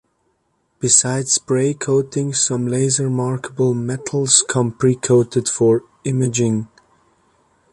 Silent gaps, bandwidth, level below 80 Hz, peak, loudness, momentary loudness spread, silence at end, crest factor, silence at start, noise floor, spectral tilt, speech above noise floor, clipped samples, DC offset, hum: none; 11.5 kHz; -56 dBFS; 0 dBFS; -17 LUFS; 9 LU; 1.05 s; 18 dB; 0.8 s; -66 dBFS; -4.5 dB/octave; 49 dB; under 0.1%; under 0.1%; none